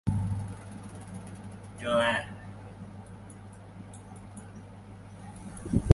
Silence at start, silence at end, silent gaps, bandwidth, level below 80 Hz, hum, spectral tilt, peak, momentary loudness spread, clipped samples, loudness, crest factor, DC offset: 0.05 s; 0 s; none; 11.5 kHz; -46 dBFS; none; -6.5 dB/octave; -4 dBFS; 19 LU; under 0.1%; -34 LUFS; 28 dB; under 0.1%